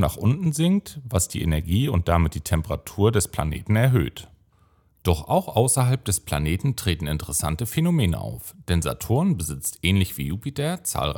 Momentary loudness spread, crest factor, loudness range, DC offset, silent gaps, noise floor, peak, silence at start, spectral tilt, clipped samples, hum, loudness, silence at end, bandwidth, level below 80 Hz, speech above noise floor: 7 LU; 20 dB; 2 LU; under 0.1%; none; -60 dBFS; -4 dBFS; 0 s; -5.5 dB/octave; under 0.1%; none; -23 LUFS; 0 s; 17.5 kHz; -40 dBFS; 37 dB